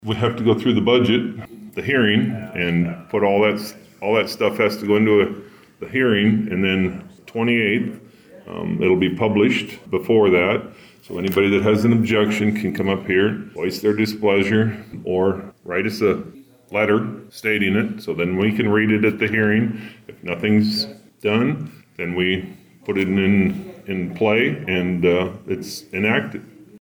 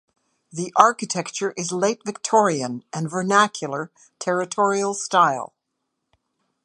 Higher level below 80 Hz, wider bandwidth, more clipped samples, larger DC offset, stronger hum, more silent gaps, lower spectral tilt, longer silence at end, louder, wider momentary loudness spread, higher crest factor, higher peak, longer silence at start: first, -56 dBFS vs -74 dBFS; first, over 20 kHz vs 11.5 kHz; neither; neither; neither; neither; first, -6.5 dB/octave vs -3.5 dB/octave; second, 0.05 s vs 1.2 s; about the same, -19 LUFS vs -21 LUFS; about the same, 13 LU vs 13 LU; second, 14 dB vs 22 dB; second, -6 dBFS vs 0 dBFS; second, 0.05 s vs 0.55 s